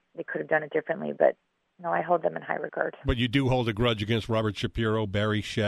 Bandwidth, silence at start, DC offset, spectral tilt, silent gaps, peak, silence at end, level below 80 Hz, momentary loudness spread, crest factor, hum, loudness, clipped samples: 12.5 kHz; 0.15 s; under 0.1%; -6.5 dB/octave; none; -8 dBFS; 0 s; -44 dBFS; 7 LU; 18 dB; none; -28 LUFS; under 0.1%